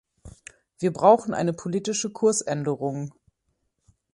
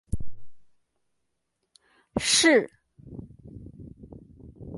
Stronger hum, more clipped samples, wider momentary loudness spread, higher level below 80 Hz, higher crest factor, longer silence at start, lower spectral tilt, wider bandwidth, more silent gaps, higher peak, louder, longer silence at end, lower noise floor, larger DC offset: neither; neither; second, 11 LU vs 27 LU; second, -60 dBFS vs -46 dBFS; about the same, 22 dB vs 22 dB; first, 0.25 s vs 0.1 s; first, -5 dB/octave vs -2.5 dB/octave; about the same, 11.5 kHz vs 11.5 kHz; neither; first, -4 dBFS vs -8 dBFS; about the same, -24 LUFS vs -22 LUFS; first, 1.05 s vs 0 s; second, -75 dBFS vs -80 dBFS; neither